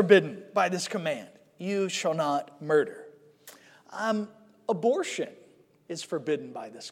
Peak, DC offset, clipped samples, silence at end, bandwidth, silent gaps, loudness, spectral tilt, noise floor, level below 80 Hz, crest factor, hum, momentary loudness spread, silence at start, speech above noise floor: -4 dBFS; under 0.1%; under 0.1%; 0 s; 16 kHz; none; -29 LUFS; -4.5 dB/octave; -53 dBFS; -88 dBFS; 24 dB; none; 13 LU; 0 s; 26 dB